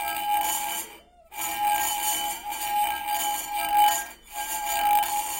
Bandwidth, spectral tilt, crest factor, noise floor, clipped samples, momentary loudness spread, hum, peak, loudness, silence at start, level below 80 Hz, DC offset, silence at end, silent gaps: 17 kHz; 1 dB/octave; 18 dB; -48 dBFS; under 0.1%; 10 LU; none; -10 dBFS; -25 LUFS; 0 s; -56 dBFS; under 0.1%; 0 s; none